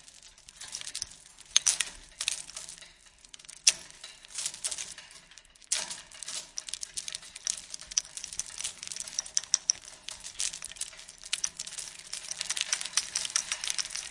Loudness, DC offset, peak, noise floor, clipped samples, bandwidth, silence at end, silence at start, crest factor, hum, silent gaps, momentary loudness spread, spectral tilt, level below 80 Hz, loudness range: -32 LUFS; under 0.1%; -2 dBFS; -56 dBFS; under 0.1%; 11.5 kHz; 0 s; 0.05 s; 34 dB; none; none; 20 LU; 3 dB/octave; -66 dBFS; 6 LU